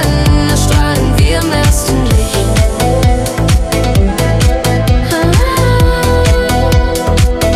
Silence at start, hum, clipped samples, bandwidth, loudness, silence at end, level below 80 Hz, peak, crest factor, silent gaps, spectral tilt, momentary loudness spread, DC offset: 0 s; none; under 0.1%; 15.5 kHz; -11 LUFS; 0 s; -14 dBFS; 0 dBFS; 10 dB; none; -5.5 dB/octave; 2 LU; under 0.1%